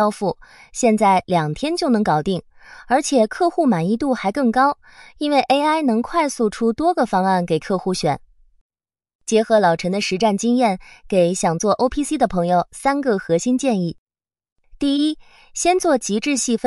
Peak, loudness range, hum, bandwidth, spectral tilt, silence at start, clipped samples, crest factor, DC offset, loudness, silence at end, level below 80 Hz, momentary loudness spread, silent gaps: -4 dBFS; 2 LU; none; 12 kHz; -5 dB/octave; 0 s; under 0.1%; 14 dB; under 0.1%; -19 LUFS; 0 s; -48 dBFS; 7 LU; 8.61-8.69 s, 9.15-9.19 s, 13.98-14.06 s, 14.52-14.56 s